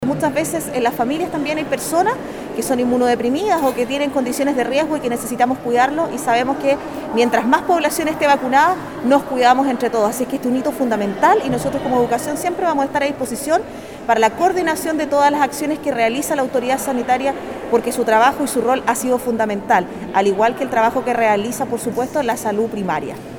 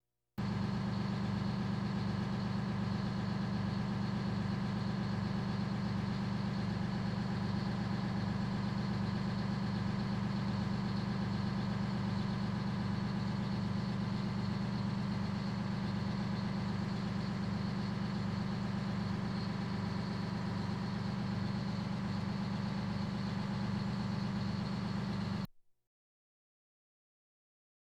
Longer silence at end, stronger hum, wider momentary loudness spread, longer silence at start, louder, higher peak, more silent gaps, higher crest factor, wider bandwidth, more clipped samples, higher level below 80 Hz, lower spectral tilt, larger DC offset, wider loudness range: second, 0 s vs 2.4 s; neither; first, 7 LU vs 1 LU; second, 0 s vs 0.35 s; first, -18 LUFS vs -37 LUFS; first, 0 dBFS vs -26 dBFS; neither; first, 18 dB vs 12 dB; first, over 20 kHz vs 9.4 kHz; neither; about the same, -50 dBFS vs -54 dBFS; second, -4 dB/octave vs -7.5 dB/octave; neither; about the same, 2 LU vs 1 LU